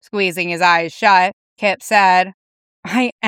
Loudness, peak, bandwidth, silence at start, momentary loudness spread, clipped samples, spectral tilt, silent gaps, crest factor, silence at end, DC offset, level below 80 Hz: -15 LUFS; 0 dBFS; 17 kHz; 0.15 s; 9 LU; under 0.1%; -3.5 dB/octave; 1.33-1.56 s, 2.34-2.83 s, 3.12-3.19 s; 16 dB; 0 s; under 0.1%; -74 dBFS